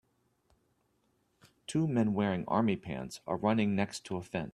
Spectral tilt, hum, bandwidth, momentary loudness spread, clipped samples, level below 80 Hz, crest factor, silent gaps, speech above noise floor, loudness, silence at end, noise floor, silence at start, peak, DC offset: -6.5 dB/octave; none; 12.5 kHz; 10 LU; under 0.1%; -64 dBFS; 20 dB; none; 43 dB; -32 LUFS; 0.05 s; -75 dBFS; 1.7 s; -14 dBFS; under 0.1%